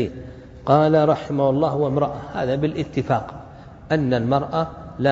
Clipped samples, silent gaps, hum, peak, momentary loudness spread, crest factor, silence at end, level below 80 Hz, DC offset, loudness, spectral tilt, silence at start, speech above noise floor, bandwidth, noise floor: under 0.1%; none; none; -2 dBFS; 17 LU; 20 dB; 0 s; -46 dBFS; under 0.1%; -21 LUFS; -8.5 dB/octave; 0 s; 21 dB; 7.8 kHz; -41 dBFS